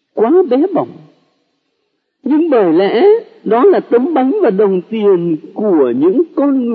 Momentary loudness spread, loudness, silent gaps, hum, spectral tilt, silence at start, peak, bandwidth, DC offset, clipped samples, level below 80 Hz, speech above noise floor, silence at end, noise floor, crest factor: 6 LU; -12 LUFS; none; none; -10 dB/octave; 0.15 s; 0 dBFS; 4.9 kHz; under 0.1%; under 0.1%; -72 dBFS; 56 dB; 0 s; -67 dBFS; 12 dB